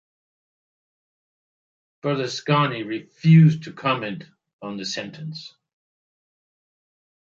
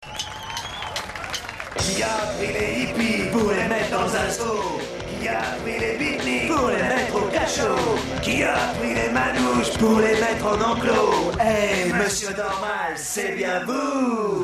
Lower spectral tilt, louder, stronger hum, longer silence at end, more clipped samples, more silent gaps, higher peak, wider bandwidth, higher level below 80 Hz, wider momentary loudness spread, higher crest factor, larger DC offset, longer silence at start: first, -6.5 dB/octave vs -4 dB/octave; about the same, -21 LUFS vs -22 LUFS; neither; first, 1.8 s vs 0 s; neither; first, 4.53-4.59 s vs none; first, -4 dBFS vs -8 dBFS; second, 7.4 kHz vs 14 kHz; second, -70 dBFS vs -44 dBFS; first, 20 LU vs 10 LU; about the same, 20 dB vs 16 dB; neither; first, 2.05 s vs 0 s